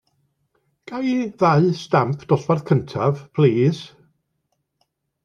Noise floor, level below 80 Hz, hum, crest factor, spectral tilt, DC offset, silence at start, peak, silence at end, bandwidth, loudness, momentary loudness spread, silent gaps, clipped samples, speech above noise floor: -73 dBFS; -60 dBFS; none; 18 dB; -8 dB/octave; under 0.1%; 0.9 s; -4 dBFS; 1.35 s; 7.2 kHz; -20 LUFS; 9 LU; none; under 0.1%; 54 dB